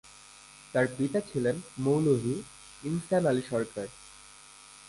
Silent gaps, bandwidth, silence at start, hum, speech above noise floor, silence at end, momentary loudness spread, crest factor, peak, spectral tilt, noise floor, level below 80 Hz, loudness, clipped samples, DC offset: none; 11.5 kHz; 0.05 s; 50 Hz at -60 dBFS; 24 dB; 0 s; 22 LU; 18 dB; -14 dBFS; -6.5 dB/octave; -52 dBFS; -62 dBFS; -30 LUFS; under 0.1%; under 0.1%